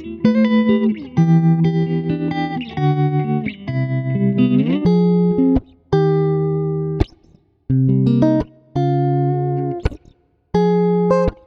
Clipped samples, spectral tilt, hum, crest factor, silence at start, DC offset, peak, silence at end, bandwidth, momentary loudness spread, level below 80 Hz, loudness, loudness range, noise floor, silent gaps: under 0.1%; -9.5 dB/octave; none; 16 dB; 0 s; under 0.1%; -2 dBFS; 0.1 s; 6.4 kHz; 8 LU; -36 dBFS; -17 LUFS; 2 LU; -53 dBFS; none